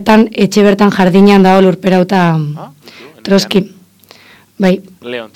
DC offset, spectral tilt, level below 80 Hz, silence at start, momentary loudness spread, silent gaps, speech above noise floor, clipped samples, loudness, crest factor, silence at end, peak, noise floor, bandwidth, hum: under 0.1%; -6.5 dB/octave; -44 dBFS; 0 s; 17 LU; none; 33 dB; 1%; -10 LUFS; 10 dB; 0.1 s; 0 dBFS; -42 dBFS; 14.5 kHz; none